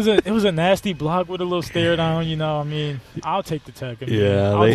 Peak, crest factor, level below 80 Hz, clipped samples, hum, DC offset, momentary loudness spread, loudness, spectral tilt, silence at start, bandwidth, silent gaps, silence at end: 0 dBFS; 20 dB; -48 dBFS; under 0.1%; none; under 0.1%; 11 LU; -21 LUFS; -6.5 dB/octave; 0 s; 14 kHz; none; 0 s